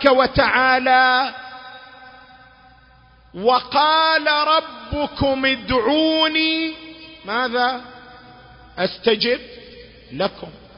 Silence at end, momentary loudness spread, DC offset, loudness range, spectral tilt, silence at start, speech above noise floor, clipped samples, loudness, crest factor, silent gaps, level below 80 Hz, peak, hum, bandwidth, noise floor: 0.2 s; 21 LU; under 0.1%; 6 LU; -7 dB/octave; 0 s; 32 dB; under 0.1%; -18 LUFS; 20 dB; none; -44 dBFS; 0 dBFS; none; 5.6 kHz; -50 dBFS